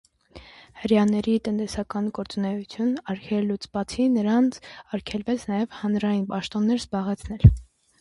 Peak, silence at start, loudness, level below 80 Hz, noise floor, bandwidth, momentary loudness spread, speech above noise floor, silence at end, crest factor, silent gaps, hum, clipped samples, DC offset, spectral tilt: 0 dBFS; 0.35 s; -25 LUFS; -36 dBFS; -48 dBFS; 11.5 kHz; 11 LU; 25 dB; 0.4 s; 24 dB; none; none; under 0.1%; under 0.1%; -7.5 dB/octave